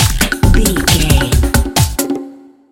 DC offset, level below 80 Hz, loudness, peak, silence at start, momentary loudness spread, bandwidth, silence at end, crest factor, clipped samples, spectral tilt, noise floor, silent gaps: under 0.1%; -16 dBFS; -13 LUFS; 0 dBFS; 0 s; 8 LU; 17.5 kHz; 0.35 s; 12 dB; 0.2%; -4 dB/octave; -34 dBFS; none